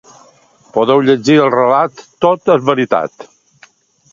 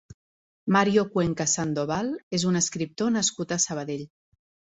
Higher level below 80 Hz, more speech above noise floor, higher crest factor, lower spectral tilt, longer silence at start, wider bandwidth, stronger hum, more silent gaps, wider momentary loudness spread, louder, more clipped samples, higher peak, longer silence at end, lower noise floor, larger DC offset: about the same, -58 dBFS vs -58 dBFS; second, 36 dB vs over 65 dB; second, 14 dB vs 20 dB; first, -6 dB/octave vs -4 dB/octave; about the same, 0.75 s vs 0.65 s; second, 7.6 kHz vs 8.4 kHz; neither; second, none vs 2.23-2.31 s; about the same, 8 LU vs 10 LU; first, -12 LUFS vs -25 LUFS; neither; first, 0 dBFS vs -6 dBFS; first, 0.85 s vs 0.65 s; second, -48 dBFS vs under -90 dBFS; neither